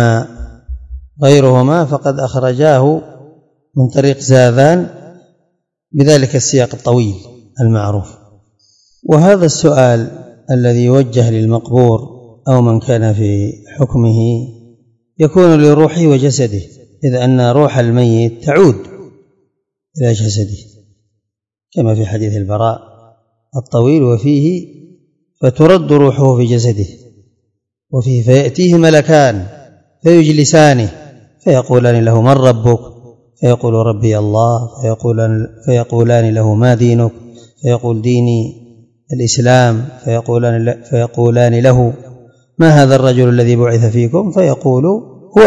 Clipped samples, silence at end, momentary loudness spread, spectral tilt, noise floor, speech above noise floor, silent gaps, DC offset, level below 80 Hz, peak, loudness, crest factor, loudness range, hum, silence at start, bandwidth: 1%; 0 s; 12 LU; -6.5 dB/octave; -78 dBFS; 69 dB; none; under 0.1%; -42 dBFS; 0 dBFS; -11 LUFS; 12 dB; 4 LU; none; 0 s; 8.8 kHz